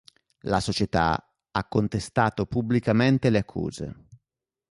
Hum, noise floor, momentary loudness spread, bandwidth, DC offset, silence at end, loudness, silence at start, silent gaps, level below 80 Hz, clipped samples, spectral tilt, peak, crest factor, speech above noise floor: none; -86 dBFS; 11 LU; 11.5 kHz; under 0.1%; 0.55 s; -25 LUFS; 0.45 s; none; -46 dBFS; under 0.1%; -6.5 dB/octave; -8 dBFS; 18 dB; 62 dB